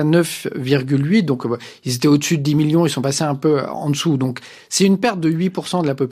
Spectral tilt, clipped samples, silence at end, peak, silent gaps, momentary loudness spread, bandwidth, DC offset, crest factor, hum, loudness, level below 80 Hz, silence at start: -5.5 dB/octave; under 0.1%; 0 s; -2 dBFS; none; 7 LU; 14.5 kHz; under 0.1%; 14 dB; none; -18 LUFS; -60 dBFS; 0 s